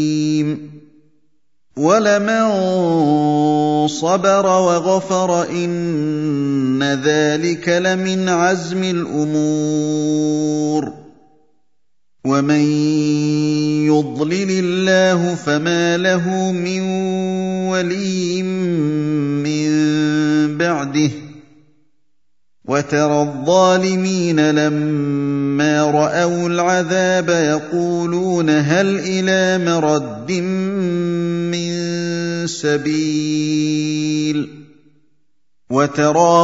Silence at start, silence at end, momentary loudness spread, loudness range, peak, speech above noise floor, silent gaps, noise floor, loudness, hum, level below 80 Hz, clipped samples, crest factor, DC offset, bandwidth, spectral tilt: 0 s; 0 s; 6 LU; 4 LU; 0 dBFS; 60 dB; none; -76 dBFS; -17 LUFS; none; -62 dBFS; under 0.1%; 16 dB; 0.2%; 7.8 kHz; -5.5 dB/octave